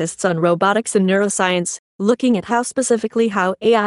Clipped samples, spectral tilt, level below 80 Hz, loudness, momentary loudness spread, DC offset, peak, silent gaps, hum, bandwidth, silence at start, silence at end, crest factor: under 0.1%; -4.5 dB/octave; -62 dBFS; -18 LUFS; 4 LU; under 0.1%; -2 dBFS; 1.79-1.99 s; none; 11.5 kHz; 0 s; 0 s; 16 dB